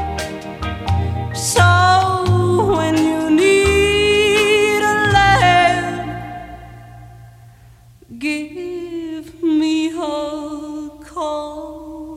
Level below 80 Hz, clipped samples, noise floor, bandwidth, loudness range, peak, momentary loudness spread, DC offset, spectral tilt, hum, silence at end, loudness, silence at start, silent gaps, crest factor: -36 dBFS; under 0.1%; -45 dBFS; 15.5 kHz; 12 LU; -2 dBFS; 18 LU; under 0.1%; -5 dB/octave; none; 0 s; -16 LUFS; 0 s; none; 16 dB